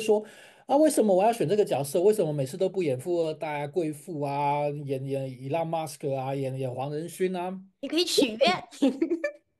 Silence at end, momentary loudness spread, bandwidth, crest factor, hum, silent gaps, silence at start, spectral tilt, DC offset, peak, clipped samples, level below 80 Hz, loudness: 0.25 s; 10 LU; 12.5 kHz; 18 dB; none; none; 0 s; -5 dB/octave; under 0.1%; -8 dBFS; under 0.1%; -74 dBFS; -27 LUFS